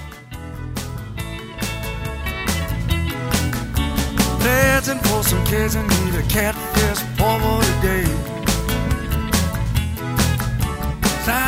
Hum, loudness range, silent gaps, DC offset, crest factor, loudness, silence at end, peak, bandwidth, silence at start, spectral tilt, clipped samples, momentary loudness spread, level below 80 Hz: none; 6 LU; none; under 0.1%; 18 dB; -20 LUFS; 0 s; -2 dBFS; 16.5 kHz; 0 s; -4.5 dB/octave; under 0.1%; 11 LU; -26 dBFS